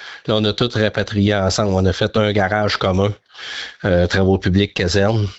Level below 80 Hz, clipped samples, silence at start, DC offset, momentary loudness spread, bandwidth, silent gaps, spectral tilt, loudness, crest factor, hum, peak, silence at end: -44 dBFS; under 0.1%; 0 s; under 0.1%; 6 LU; 8.2 kHz; none; -5.5 dB/octave; -17 LUFS; 14 dB; none; -4 dBFS; 0 s